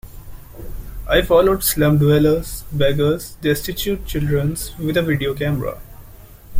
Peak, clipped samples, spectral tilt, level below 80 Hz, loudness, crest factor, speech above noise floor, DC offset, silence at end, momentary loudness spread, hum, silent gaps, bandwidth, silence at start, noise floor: 0 dBFS; under 0.1%; -5.5 dB/octave; -32 dBFS; -18 LUFS; 18 dB; 23 dB; under 0.1%; 0 s; 18 LU; none; none; 16.5 kHz; 0.05 s; -40 dBFS